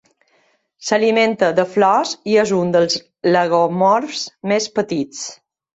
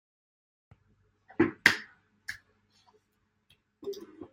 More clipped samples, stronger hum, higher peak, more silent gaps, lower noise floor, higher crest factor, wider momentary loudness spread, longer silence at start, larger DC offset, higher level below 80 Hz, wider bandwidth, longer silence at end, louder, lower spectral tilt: neither; neither; about the same, -2 dBFS vs -2 dBFS; neither; second, -61 dBFS vs -76 dBFS; second, 16 dB vs 34 dB; second, 10 LU vs 22 LU; second, 0.8 s vs 1.4 s; neither; first, -62 dBFS vs -68 dBFS; second, 8.2 kHz vs 16 kHz; first, 0.4 s vs 0.05 s; first, -17 LUFS vs -28 LUFS; about the same, -4.5 dB/octave vs -3.5 dB/octave